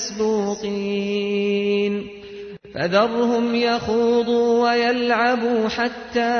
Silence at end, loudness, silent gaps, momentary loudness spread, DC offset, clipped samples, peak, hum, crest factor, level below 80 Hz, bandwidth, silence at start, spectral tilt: 0 s; -20 LUFS; none; 9 LU; under 0.1%; under 0.1%; -6 dBFS; none; 14 dB; -54 dBFS; 6.6 kHz; 0 s; -4.5 dB/octave